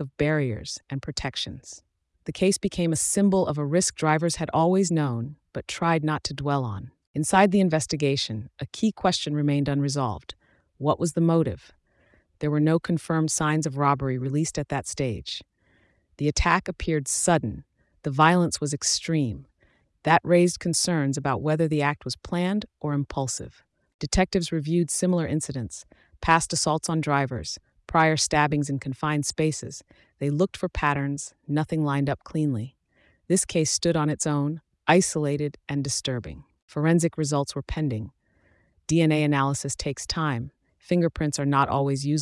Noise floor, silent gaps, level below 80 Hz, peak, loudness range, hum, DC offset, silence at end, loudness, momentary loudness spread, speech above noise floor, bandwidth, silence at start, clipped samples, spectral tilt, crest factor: -65 dBFS; 7.07-7.14 s, 23.94-23.99 s, 36.62-36.68 s; -46 dBFS; -6 dBFS; 3 LU; none; under 0.1%; 0 s; -25 LUFS; 12 LU; 40 dB; 12 kHz; 0 s; under 0.1%; -5 dB/octave; 18 dB